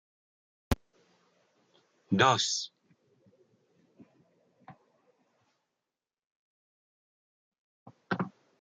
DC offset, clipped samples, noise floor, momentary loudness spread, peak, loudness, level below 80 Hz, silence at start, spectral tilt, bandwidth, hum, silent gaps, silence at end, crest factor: under 0.1%; under 0.1%; under -90 dBFS; 14 LU; -10 dBFS; -30 LUFS; -54 dBFS; 0.7 s; -3.5 dB/octave; 10 kHz; none; 6.26-7.52 s, 7.58-7.86 s; 0.35 s; 28 dB